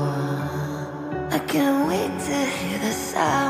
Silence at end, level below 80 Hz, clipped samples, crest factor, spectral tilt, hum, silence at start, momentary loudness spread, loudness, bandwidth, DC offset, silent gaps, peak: 0 s; -52 dBFS; under 0.1%; 14 dB; -5 dB/octave; none; 0 s; 9 LU; -24 LUFS; 15.5 kHz; under 0.1%; none; -8 dBFS